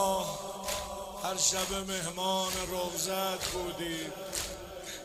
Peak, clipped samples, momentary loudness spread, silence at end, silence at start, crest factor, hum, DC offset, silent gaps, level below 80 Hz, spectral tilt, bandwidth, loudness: -14 dBFS; under 0.1%; 10 LU; 0 s; 0 s; 20 dB; none; under 0.1%; none; -54 dBFS; -2 dB/octave; 16 kHz; -33 LUFS